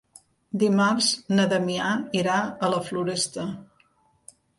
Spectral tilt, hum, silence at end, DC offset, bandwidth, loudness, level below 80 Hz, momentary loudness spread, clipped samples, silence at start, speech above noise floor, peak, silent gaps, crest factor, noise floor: -4 dB/octave; none; 0.95 s; under 0.1%; 11.5 kHz; -24 LUFS; -66 dBFS; 11 LU; under 0.1%; 0.55 s; 40 dB; -10 dBFS; none; 16 dB; -64 dBFS